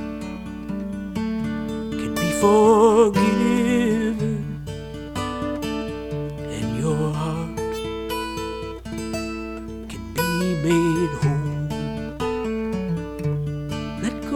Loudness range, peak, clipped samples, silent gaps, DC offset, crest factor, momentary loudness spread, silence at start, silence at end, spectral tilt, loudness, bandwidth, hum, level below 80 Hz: 8 LU; -6 dBFS; under 0.1%; none; under 0.1%; 18 dB; 14 LU; 0 s; 0 s; -6 dB/octave; -23 LUFS; 18 kHz; none; -42 dBFS